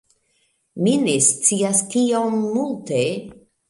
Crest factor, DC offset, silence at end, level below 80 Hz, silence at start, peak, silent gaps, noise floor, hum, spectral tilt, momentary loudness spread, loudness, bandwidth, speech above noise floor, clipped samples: 20 dB; under 0.1%; 0.35 s; -64 dBFS; 0.75 s; -2 dBFS; none; -66 dBFS; none; -4 dB/octave; 9 LU; -19 LUFS; 11.5 kHz; 47 dB; under 0.1%